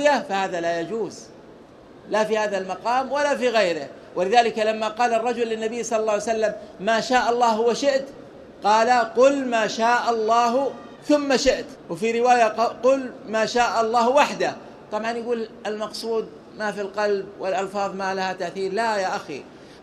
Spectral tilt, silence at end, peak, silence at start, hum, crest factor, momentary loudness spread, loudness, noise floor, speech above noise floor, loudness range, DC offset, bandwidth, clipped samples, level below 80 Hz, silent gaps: -3.5 dB/octave; 0 s; -2 dBFS; 0 s; none; 20 dB; 11 LU; -22 LUFS; -46 dBFS; 24 dB; 6 LU; under 0.1%; 13 kHz; under 0.1%; -58 dBFS; none